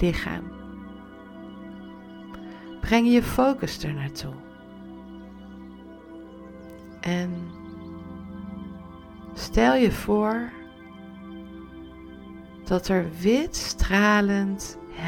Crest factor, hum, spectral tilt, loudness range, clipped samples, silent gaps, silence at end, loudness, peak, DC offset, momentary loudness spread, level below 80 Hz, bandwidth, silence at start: 22 dB; none; -5.5 dB/octave; 11 LU; under 0.1%; none; 0 s; -24 LUFS; -4 dBFS; under 0.1%; 23 LU; -40 dBFS; 18.5 kHz; 0 s